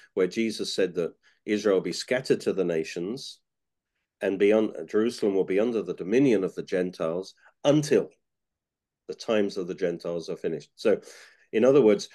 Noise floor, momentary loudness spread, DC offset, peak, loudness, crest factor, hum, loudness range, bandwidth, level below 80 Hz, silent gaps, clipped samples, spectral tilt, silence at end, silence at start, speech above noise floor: -88 dBFS; 11 LU; under 0.1%; -8 dBFS; -26 LUFS; 18 dB; none; 4 LU; 12.5 kHz; -72 dBFS; none; under 0.1%; -5.5 dB/octave; 0.1 s; 0.15 s; 63 dB